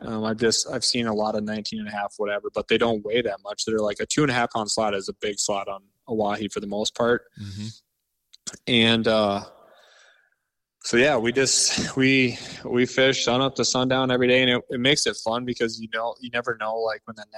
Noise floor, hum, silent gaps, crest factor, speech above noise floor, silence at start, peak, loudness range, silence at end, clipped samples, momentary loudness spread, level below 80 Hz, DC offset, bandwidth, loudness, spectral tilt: -76 dBFS; none; none; 18 dB; 53 dB; 0 s; -6 dBFS; 5 LU; 0 s; under 0.1%; 11 LU; -58 dBFS; under 0.1%; 13.5 kHz; -23 LUFS; -3 dB/octave